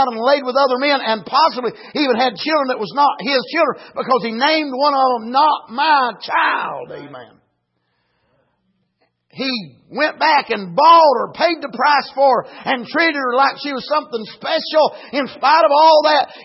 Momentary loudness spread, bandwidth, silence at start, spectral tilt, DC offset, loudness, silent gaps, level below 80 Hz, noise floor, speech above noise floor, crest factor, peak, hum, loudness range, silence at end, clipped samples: 12 LU; 6 kHz; 0 s; -6.5 dB/octave; under 0.1%; -16 LUFS; none; -72 dBFS; -69 dBFS; 53 dB; 14 dB; -2 dBFS; none; 8 LU; 0 s; under 0.1%